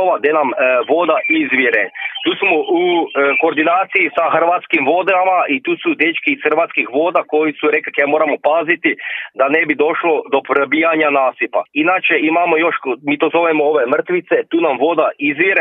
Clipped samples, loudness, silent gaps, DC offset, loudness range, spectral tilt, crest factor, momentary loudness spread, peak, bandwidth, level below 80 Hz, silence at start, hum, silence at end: under 0.1%; -14 LUFS; none; under 0.1%; 1 LU; -7.5 dB/octave; 14 dB; 4 LU; 0 dBFS; 3.9 kHz; -70 dBFS; 0 s; none; 0 s